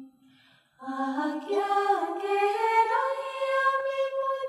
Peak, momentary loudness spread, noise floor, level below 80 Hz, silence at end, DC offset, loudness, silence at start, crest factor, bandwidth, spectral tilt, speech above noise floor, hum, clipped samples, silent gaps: -12 dBFS; 7 LU; -61 dBFS; -88 dBFS; 0 s; under 0.1%; -27 LUFS; 0 s; 16 dB; 13.5 kHz; -2.5 dB/octave; 34 dB; none; under 0.1%; none